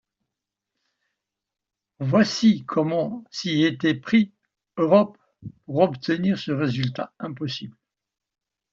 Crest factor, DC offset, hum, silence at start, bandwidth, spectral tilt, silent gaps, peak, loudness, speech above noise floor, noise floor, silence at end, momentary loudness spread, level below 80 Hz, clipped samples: 20 dB; under 0.1%; none; 2 s; 7.6 kHz; -5.5 dB/octave; none; -4 dBFS; -23 LUFS; 64 dB; -86 dBFS; 1 s; 14 LU; -64 dBFS; under 0.1%